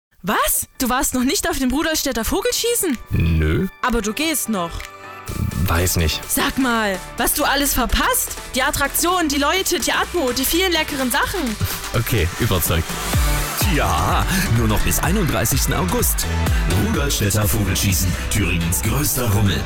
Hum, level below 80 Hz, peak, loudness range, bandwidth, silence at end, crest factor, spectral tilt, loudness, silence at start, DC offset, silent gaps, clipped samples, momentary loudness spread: none; -28 dBFS; -8 dBFS; 2 LU; 19.5 kHz; 0 s; 10 dB; -4 dB/octave; -19 LUFS; 0.25 s; 0.2%; none; under 0.1%; 4 LU